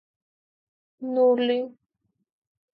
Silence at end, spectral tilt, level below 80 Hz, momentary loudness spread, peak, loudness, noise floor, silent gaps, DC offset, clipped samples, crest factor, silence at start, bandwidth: 1.05 s; -7.5 dB/octave; -84 dBFS; 17 LU; -12 dBFS; -23 LUFS; -76 dBFS; none; under 0.1%; under 0.1%; 16 dB; 1 s; 4.7 kHz